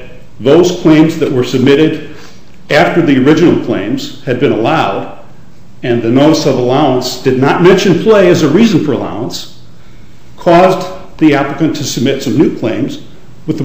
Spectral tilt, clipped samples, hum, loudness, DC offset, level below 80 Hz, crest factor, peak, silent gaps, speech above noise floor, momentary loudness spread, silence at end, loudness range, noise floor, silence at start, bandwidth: -6 dB/octave; 0.6%; none; -10 LUFS; 5%; -40 dBFS; 10 dB; 0 dBFS; none; 29 dB; 13 LU; 0 s; 4 LU; -38 dBFS; 0 s; 16 kHz